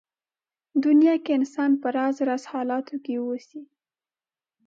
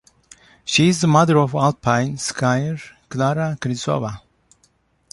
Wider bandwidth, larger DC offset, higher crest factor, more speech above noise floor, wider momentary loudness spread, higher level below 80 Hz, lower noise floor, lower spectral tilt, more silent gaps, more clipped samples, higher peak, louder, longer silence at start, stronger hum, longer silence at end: second, 7.6 kHz vs 11.5 kHz; neither; about the same, 14 dB vs 18 dB; first, over 67 dB vs 43 dB; second, 13 LU vs 16 LU; second, -84 dBFS vs -54 dBFS; first, under -90 dBFS vs -61 dBFS; about the same, -5 dB/octave vs -5.5 dB/octave; neither; neither; second, -10 dBFS vs -2 dBFS; second, -24 LUFS vs -19 LUFS; about the same, 0.75 s vs 0.65 s; neither; about the same, 1 s vs 0.95 s